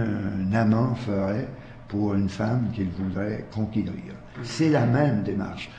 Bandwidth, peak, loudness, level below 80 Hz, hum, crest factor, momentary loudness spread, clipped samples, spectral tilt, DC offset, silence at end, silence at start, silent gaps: 9.2 kHz; -8 dBFS; -26 LUFS; -50 dBFS; none; 18 dB; 12 LU; under 0.1%; -8 dB/octave; under 0.1%; 0 s; 0 s; none